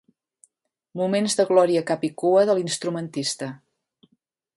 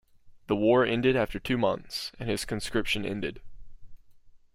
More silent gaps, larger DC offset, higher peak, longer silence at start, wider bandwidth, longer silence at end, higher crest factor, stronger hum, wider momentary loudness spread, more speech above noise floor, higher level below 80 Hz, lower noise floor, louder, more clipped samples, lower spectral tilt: neither; neither; first, -4 dBFS vs -10 dBFS; first, 0.95 s vs 0.25 s; second, 11.5 kHz vs 16 kHz; first, 1 s vs 0.2 s; about the same, 20 dB vs 18 dB; neither; about the same, 11 LU vs 11 LU; first, 50 dB vs 26 dB; second, -72 dBFS vs -48 dBFS; first, -72 dBFS vs -53 dBFS; first, -22 LUFS vs -28 LUFS; neither; about the same, -4.5 dB/octave vs -5 dB/octave